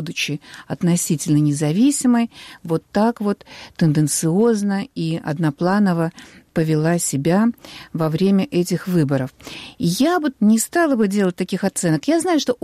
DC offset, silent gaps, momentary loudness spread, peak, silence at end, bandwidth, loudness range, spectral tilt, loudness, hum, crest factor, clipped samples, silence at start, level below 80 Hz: under 0.1%; none; 9 LU; -6 dBFS; 0.1 s; 15.5 kHz; 1 LU; -5.5 dB/octave; -19 LUFS; none; 12 dB; under 0.1%; 0 s; -56 dBFS